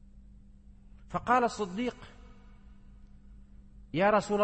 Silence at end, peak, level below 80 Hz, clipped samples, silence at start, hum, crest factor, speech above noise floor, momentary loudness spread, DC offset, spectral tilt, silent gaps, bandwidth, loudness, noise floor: 0 s; -14 dBFS; -54 dBFS; under 0.1%; 0.15 s; none; 20 dB; 25 dB; 16 LU; under 0.1%; -5.5 dB/octave; none; 8.8 kHz; -30 LUFS; -54 dBFS